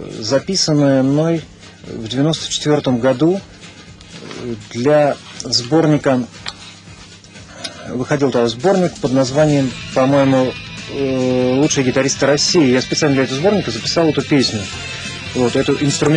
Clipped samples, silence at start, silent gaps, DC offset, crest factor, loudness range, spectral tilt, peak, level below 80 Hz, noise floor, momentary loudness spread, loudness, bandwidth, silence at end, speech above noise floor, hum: under 0.1%; 0 s; none; under 0.1%; 14 dB; 4 LU; -5 dB/octave; -2 dBFS; -46 dBFS; -38 dBFS; 15 LU; -16 LUFS; 10.5 kHz; 0 s; 23 dB; none